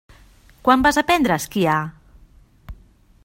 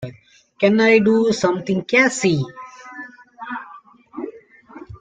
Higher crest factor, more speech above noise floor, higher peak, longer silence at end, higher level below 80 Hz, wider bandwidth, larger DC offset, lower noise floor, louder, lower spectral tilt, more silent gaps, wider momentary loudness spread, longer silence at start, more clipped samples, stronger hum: about the same, 22 dB vs 18 dB; about the same, 34 dB vs 33 dB; about the same, 0 dBFS vs -2 dBFS; first, 0.5 s vs 0.05 s; first, -44 dBFS vs -58 dBFS; first, 16.5 kHz vs 9.4 kHz; neither; about the same, -51 dBFS vs -49 dBFS; about the same, -18 LUFS vs -17 LUFS; about the same, -4.5 dB/octave vs -5 dB/octave; neither; second, 8 LU vs 24 LU; first, 0.65 s vs 0 s; neither; neither